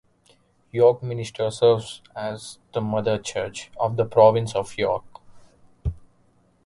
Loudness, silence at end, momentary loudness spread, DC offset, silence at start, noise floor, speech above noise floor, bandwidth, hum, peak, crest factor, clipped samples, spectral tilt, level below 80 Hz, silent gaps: -23 LUFS; 0.65 s; 16 LU; under 0.1%; 0.75 s; -61 dBFS; 39 dB; 11.5 kHz; none; -2 dBFS; 22 dB; under 0.1%; -5.5 dB/octave; -46 dBFS; none